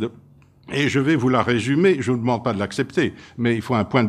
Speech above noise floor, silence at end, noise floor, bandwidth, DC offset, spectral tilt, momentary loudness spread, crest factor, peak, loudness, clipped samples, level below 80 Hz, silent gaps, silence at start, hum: 30 dB; 0 s; -50 dBFS; 12.5 kHz; under 0.1%; -6.5 dB/octave; 7 LU; 18 dB; -2 dBFS; -21 LUFS; under 0.1%; -56 dBFS; none; 0 s; none